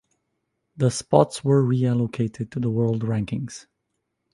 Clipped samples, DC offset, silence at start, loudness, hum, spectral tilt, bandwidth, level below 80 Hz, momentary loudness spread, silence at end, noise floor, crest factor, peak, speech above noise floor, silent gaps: under 0.1%; under 0.1%; 0.75 s; -23 LUFS; none; -7 dB/octave; 11.5 kHz; -56 dBFS; 10 LU; 0.7 s; -77 dBFS; 22 dB; -2 dBFS; 55 dB; none